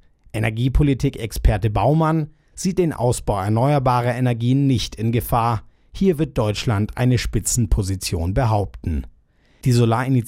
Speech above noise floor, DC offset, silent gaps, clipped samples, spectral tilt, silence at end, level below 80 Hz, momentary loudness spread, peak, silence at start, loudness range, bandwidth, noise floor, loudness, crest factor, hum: 37 dB; under 0.1%; none; under 0.1%; -6 dB/octave; 0 s; -30 dBFS; 7 LU; -4 dBFS; 0.35 s; 2 LU; 16 kHz; -56 dBFS; -20 LUFS; 16 dB; none